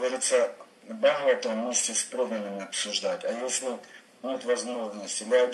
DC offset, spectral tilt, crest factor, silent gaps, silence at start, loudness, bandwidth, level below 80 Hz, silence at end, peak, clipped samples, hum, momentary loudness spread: under 0.1%; -1.5 dB/octave; 18 dB; none; 0 s; -28 LUFS; 12.5 kHz; -86 dBFS; 0 s; -10 dBFS; under 0.1%; none; 11 LU